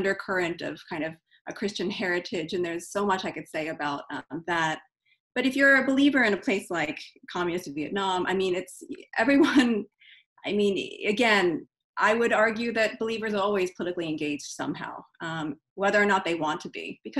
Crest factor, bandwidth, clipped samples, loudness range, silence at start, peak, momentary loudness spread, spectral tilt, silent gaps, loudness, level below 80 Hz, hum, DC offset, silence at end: 20 dB; 12.5 kHz; under 0.1%; 6 LU; 0 s; -8 dBFS; 15 LU; -4.5 dB/octave; 1.41-1.45 s, 5.20-5.31 s, 10.26-10.36 s, 11.84-11.94 s, 15.70-15.76 s; -26 LUFS; -66 dBFS; none; under 0.1%; 0 s